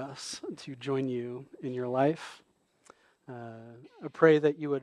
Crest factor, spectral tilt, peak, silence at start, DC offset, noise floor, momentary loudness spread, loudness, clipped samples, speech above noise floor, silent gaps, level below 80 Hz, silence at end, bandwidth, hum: 24 dB; -6 dB/octave; -8 dBFS; 0 s; under 0.1%; -62 dBFS; 23 LU; -30 LUFS; under 0.1%; 31 dB; none; -80 dBFS; 0 s; 11 kHz; none